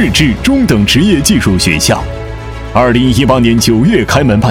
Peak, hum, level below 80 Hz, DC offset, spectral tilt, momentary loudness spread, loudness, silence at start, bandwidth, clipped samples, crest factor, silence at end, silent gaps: 0 dBFS; none; -24 dBFS; under 0.1%; -5 dB/octave; 7 LU; -9 LUFS; 0 s; 17.5 kHz; 0.9%; 10 dB; 0 s; none